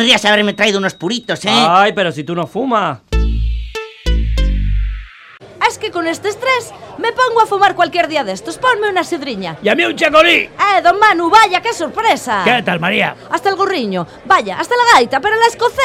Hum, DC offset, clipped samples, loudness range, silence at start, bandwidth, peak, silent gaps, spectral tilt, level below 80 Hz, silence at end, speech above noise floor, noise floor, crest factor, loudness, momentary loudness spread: none; under 0.1%; under 0.1%; 7 LU; 0 s; 15.5 kHz; 0 dBFS; none; -4 dB/octave; -24 dBFS; 0 s; 25 dB; -38 dBFS; 14 dB; -13 LUFS; 11 LU